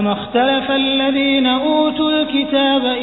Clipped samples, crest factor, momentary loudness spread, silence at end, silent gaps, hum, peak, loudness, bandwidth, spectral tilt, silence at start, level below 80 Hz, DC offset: under 0.1%; 12 dB; 2 LU; 0 s; none; none; -2 dBFS; -15 LUFS; 4.1 kHz; -8 dB/octave; 0 s; -48 dBFS; under 0.1%